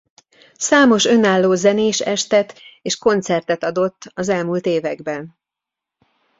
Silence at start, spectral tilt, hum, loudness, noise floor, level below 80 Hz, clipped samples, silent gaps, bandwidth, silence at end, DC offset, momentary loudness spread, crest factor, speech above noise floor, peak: 0.6 s; -4 dB/octave; none; -17 LUFS; -85 dBFS; -60 dBFS; under 0.1%; none; 8 kHz; 1.1 s; under 0.1%; 13 LU; 16 dB; 68 dB; -2 dBFS